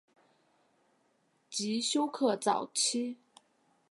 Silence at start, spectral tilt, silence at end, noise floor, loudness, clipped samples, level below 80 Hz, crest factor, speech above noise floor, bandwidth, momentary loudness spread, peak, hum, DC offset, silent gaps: 1.5 s; -2.5 dB/octave; 0.75 s; -73 dBFS; -32 LUFS; under 0.1%; -90 dBFS; 20 dB; 42 dB; 11.5 kHz; 10 LU; -14 dBFS; none; under 0.1%; none